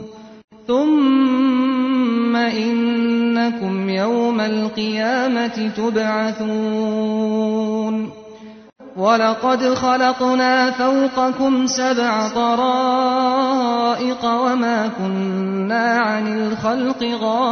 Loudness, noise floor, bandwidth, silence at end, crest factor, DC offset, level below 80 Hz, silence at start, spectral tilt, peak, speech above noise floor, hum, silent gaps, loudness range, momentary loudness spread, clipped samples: -18 LUFS; -39 dBFS; 6.6 kHz; 0 s; 14 dB; under 0.1%; -60 dBFS; 0 s; -5 dB/octave; -2 dBFS; 21 dB; none; 0.44-0.48 s; 3 LU; 6 LU; under 0.1%